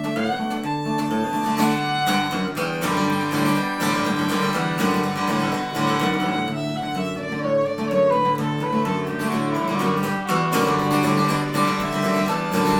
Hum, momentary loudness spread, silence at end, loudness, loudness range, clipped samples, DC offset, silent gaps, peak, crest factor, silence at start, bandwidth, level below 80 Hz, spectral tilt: none; 5 LU; 0 s; -22 LUFS; 2 LU; under 0.1%; under 0.1%; none; -6 dBFS; 14 dB; 0 s; 19 kHz; -54 dBFS; -5 dB/octave